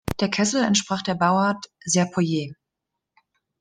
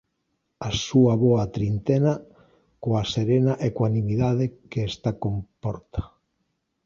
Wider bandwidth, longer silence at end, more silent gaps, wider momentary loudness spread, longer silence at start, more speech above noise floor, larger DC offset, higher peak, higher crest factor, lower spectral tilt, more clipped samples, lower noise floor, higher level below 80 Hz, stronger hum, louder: first, 12.5 kHz vs 7.4 kHz; first, 1.1 s vs 0.8 s; neither; second, 8 LU vs 13 LU; second, 0.05 s vs 0.6 s; first, 61 dB vs 53 dB; neither; about the same, -6 dBFS vs -6 dBFS; about the same, 18 dB vs 18 dB; second, -4 dB/octave vs -7 dB/octave; neither; first, -83 dBFS vs -75 dBFS; second, -52 dBFS vs -46 dBFS; neither; about the same, -22 LUFS vs -24 LUFS